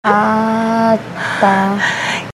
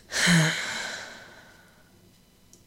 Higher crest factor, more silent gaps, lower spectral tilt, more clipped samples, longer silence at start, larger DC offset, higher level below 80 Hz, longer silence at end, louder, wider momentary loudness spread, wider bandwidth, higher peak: second, 14 dB vs 20 dB; neither; first, -5 dB/octave vs -3.5 dB/octave; neither; about the same, 0.05 s vs 0.1 s; neither; about the same, -56 dBFS vs -58 dBFS; second, 0 s vs 1.25 s; first, -14 LUFS vs -24 LUFS; second, 5 LU vs 21 LU; second, 13 kHz vs 16 kHz; first, 0 dBFS vs -8 dBFS